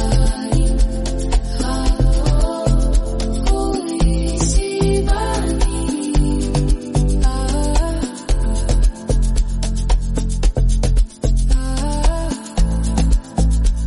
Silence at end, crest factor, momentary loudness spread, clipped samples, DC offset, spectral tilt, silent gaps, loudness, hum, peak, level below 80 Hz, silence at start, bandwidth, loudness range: 0 s; 12 dB; 4 LU; under 0.1%; under 0.1%; -6 dB/octave; none; -19 LUFS; none; -4 dBFS; -16 dBFS; 0 s; 11.5 kHz; 1 LU